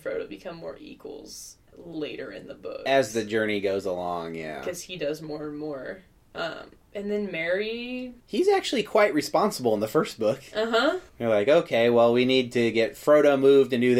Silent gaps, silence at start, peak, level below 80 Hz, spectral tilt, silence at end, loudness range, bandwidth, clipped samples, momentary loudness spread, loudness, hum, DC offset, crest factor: none; 0.05 s; -8 dBFS; -60 dBFS; -5 dB/octave; 0 s; 10 LU; 16 kHz; under 0.1%; 20 LU; -25 LUFS; none; under 0.1%; 18 dB